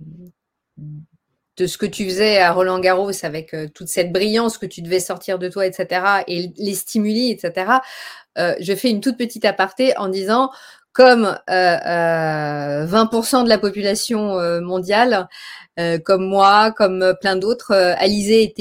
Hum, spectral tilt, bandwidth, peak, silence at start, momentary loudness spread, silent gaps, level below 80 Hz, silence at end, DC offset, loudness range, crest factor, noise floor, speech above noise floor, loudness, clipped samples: none; -4 dB/octave; 16.5 kHz; 0 dBFS; 0 s; 11 LU; none; -56 dBFS; 0.1 s; under 0.1%; 4 LU; 18 dB; -56 dBFS; 39 dB; -17 LUFS; under 0.1%